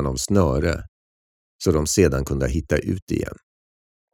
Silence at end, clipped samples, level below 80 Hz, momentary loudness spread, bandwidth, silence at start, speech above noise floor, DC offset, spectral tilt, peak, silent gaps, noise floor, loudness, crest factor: 0.8 s; under 0.1%; -34 dBFS; 9 LU; 17.5 kHz; 0 s; over 69 dB; under 0.1%; -5.5 dB/octave; -4 dBFS; 0.88-1.59 s, 3.02-3.07 s; under -90 dBFS; -22 LUFS; 20 dB